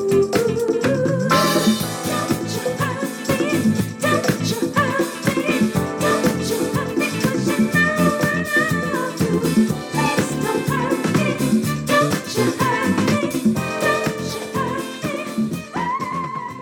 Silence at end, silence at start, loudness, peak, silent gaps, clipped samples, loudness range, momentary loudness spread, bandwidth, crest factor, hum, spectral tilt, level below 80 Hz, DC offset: 0 s; 0 s; -20 LUFS; -4 dBFS; none; under 0.1%; 2 LU; 7 LU; 18.5 kHz; 14 dB; none; -5 dB/octave; -50 dBFS; under 0.1%